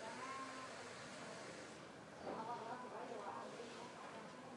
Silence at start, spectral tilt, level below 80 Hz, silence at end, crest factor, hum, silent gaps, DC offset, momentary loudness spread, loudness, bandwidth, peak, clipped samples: 0 s; -3.5 dB/octave; -86 dBFS; 0 s; 16 dB; none; none; under 0.1%; 6 LU; -51 LUFS; 11.5 kHz; -34 dBFS; under 0.1%